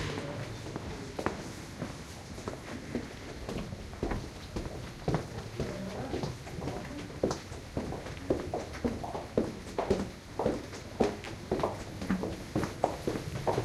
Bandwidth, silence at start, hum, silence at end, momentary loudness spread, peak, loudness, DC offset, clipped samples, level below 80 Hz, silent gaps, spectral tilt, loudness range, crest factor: 15 kHz; 0 s; none; 0 s; 9 LU; -10 dBFS; -37 LUFS; under 0.1%; under 0.1%; -48 dBFS; none; -6 dB/octave; 6 LU; 26 dB